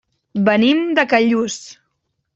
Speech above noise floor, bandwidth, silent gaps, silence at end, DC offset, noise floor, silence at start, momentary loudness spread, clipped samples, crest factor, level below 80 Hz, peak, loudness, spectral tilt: 56 dB; 8 kHz; none; 0.65 s; under 0.1%; -72 dBFS; 0.35 s; 12 LU; under 0.1%; 16 dB; -62 dBFS; -2 dBFS; -16 LUFS; -4.5 dB/octave